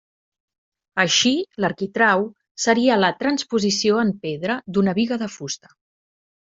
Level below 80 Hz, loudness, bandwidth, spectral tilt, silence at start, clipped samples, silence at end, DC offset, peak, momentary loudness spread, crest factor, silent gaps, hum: -62 dBFS; -20 LUFS; 7.8 kHz; -3.5 dB/octave; 0.95 s; under 0.1%; 1 s; under 0.1%; -2 dBFS; 11 LU; 20 dB; 2.51-2.55 s; none